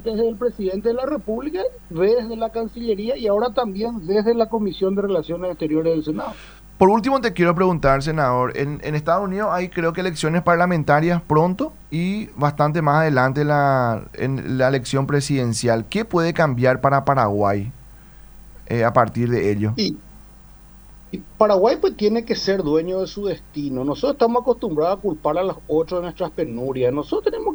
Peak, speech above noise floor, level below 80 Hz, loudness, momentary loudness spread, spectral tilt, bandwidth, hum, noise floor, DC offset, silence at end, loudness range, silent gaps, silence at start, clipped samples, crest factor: 0 dBFS; 25 dB; -44 dBFS; -20 LUFS; 8 LU; -6.5 dB/octave; over 20 kHz; none; -44 dBFS; under 0.1%; 0 s; 3 LU; none; 0 s; under 0.1%; 20 dB